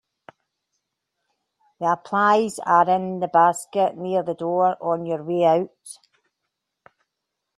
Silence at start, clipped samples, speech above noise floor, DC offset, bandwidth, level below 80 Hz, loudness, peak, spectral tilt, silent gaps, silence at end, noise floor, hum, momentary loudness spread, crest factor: 1.8 s; under 0.1%; 60 dB; under 0.1%; 13 kHz; -72 dBFS; -21 LUFS; -4 dBFS; -5.5 dB/octave; none; 1.65 s; -81 dBFS; none; 8 LU; 20 dB